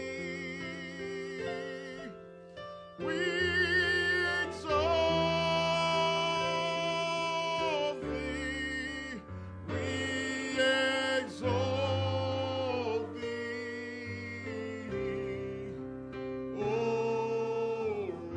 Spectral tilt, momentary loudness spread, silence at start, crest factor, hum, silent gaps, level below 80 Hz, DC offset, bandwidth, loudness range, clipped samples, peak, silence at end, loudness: -4.5 dB/octave; 13 LU; 0 s; 16 dB; none; none; -56 dBFS; under 0.1%; 10.5 kHz; 8 LU; under 0.1%; -16 dBFS; 0 s; -32 LUFS